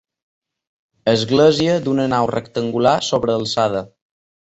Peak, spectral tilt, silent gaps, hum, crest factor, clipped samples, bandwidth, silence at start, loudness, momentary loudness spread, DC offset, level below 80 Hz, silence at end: -2 dBFS; -5.5 dB/octave; none; none; 16 dB; under 0.1%; 8.2 kHz; 1.05 s; -17 LUFS; 9 LU; under 0.1%; -52 dBFS; 0.65 s